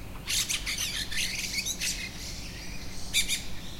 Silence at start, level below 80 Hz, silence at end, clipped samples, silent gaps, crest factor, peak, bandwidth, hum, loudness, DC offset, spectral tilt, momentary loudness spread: 0 s; -44 dBFS; 0 s; under 0.1%; none; 18 dB; -14 dBFS; 16.5 kHz; none; -30 LUFS; under 0.1%; -0.5 dB/octave; 13 LU